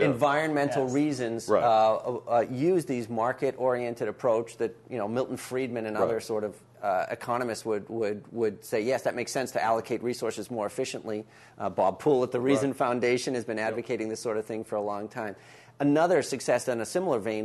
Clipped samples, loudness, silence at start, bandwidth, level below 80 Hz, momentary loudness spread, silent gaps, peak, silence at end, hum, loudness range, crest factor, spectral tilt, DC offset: under 0.1%; -28 LUFS; 0 s; 12.5 kHz; -70 dBFS; 9 LU; none; -10 dBFS; 0 s; none; 4 LU; 18 dB; -5.5 dB/octave; under 0.1%